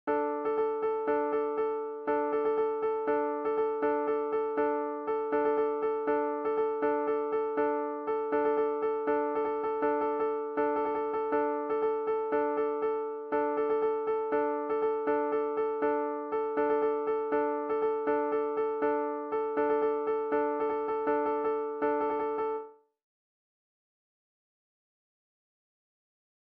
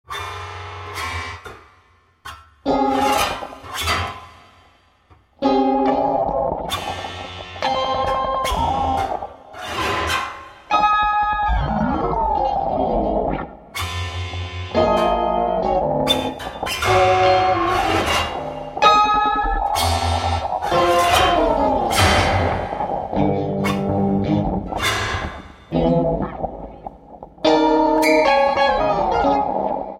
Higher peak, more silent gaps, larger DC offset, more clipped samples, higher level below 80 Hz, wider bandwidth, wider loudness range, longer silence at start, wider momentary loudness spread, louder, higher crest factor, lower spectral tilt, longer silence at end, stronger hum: second, -18 dBFS vs 0 dBFS; neither; neither; neither; second, -70 dBFS vs -34 dBFS; second, 4.6 kHz vs 16.5 kHz; second, 1 LU vs 6 LU; about the same, 0.05 s vs 0.1 s; second, 3 LU vs 15 LU; second, -30 LUFS vs -19 LUFS; about the same, 14 dB vs 18 dB; about the same, -4 dB/octave vs -4.5 dB/octave; first, 3.75 s vs 0 s; neither